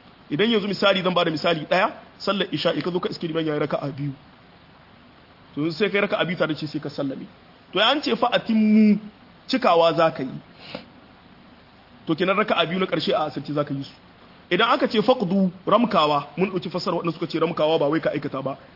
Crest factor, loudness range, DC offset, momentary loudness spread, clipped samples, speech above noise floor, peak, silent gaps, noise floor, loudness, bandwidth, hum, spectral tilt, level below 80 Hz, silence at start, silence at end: 20 dB; 6 LU; under 0.1%; 12 LU; under 0.1%; 28 dB; -4 dBFS; none; -50 dBFS; -22 LUFS; 5.8 kHz; none; -6.5 dB/octave; -62 dBFS; 0.3 s; 0.15 s